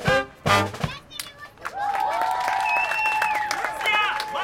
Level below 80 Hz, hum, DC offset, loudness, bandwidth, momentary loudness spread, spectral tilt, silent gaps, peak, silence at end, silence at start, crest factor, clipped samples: -50 dBFS; none; under 0.1%; -23 LUFS; 17 kHz; 14 LU; -3.5 dB/octave; none; -6 dBFS; 0 s; 0 s; 20 dB; under 0.1%